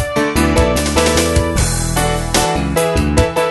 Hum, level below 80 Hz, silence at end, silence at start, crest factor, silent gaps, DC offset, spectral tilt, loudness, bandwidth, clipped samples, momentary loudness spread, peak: none; -22 dBFS; 0 s; 0 s; 14 dB; none; under 0.1%; -4.5 dB/octave; -14 LUFS; 12.5 kHz; under 0.1%; 3 LU; 0 dBFS